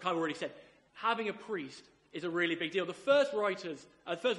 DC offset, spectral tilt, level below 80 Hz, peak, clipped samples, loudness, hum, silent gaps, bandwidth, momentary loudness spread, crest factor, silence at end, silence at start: under 0.1%; -4.5 dB/octave; -80 dBFS; -14 dBFS; under 0.1%; -34 LUFS; none; none; 11.5 kHz; 16 LU; 20 dB; 0 s; 0 s